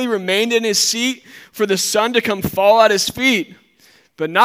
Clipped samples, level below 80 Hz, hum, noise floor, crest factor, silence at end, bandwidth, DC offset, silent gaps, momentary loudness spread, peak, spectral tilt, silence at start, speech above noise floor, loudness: under 0.1%; -54 dBFS; none; -52 dBFS; 16 dB; 0 s; 16.5 kHz; under 0.1%; none; 12 LU; 0 dBFS; -2.5 dB/octave; 0 s; 36 dB; -16 LUFS